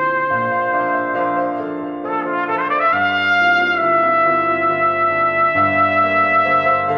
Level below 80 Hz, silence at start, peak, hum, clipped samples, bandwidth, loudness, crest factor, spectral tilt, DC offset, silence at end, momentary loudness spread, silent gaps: -64 dBFS; 0 s; -4 dBFS; none; under 0.1%; 6.8 kHz; -16 LUFS; 12 dB; -6.5 dB/octave; under 0.1%; 0 s; 7 LU; none